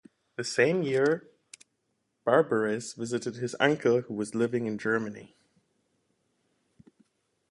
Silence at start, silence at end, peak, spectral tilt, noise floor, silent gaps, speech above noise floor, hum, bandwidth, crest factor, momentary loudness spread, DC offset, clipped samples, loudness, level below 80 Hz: 0.4 s; 2.25 s; -6 dBFS; -5 dB/octave; -78 dBFS; none; 50 dB; none; 11.5 kHz; 24 dB; 10 LU; under 0.1%; under 0.1%; -28 LUFS; -74 dBFS